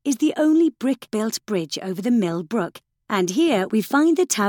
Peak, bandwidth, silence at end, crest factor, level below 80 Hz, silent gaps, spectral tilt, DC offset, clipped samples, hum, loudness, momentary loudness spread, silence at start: -6 dBFS; 18 kHz; 0 s; 16 dB; -68 dBFS; none; -4.5 dB/octave; under 0.1%; under 0.1%; none; -21 LUFS; 8 LU; 0.05 s